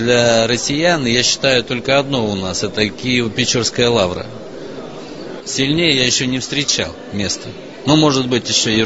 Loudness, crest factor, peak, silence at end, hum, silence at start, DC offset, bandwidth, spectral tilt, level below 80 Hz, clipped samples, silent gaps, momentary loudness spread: -15 LUFS; 16 dB; 0 dBFS; 0 s; none; 0 s; 0.7%; 8 kHz; -3.5 dB/octave; -44 dBFS; under 0.1%; none; 17 LU